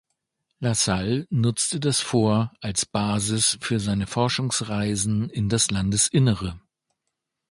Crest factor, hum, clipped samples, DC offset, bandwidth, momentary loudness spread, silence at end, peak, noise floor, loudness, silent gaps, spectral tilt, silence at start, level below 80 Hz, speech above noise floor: 18 dB; none; under 0.1%; under 0.1%; 11.5 kHz; 5 LU; 0.95 s; -6 dBFS; -81 dBFS; -23 LUFS; none; -4 dB/octave; 0.6 s; -48 dBFS; 58 dB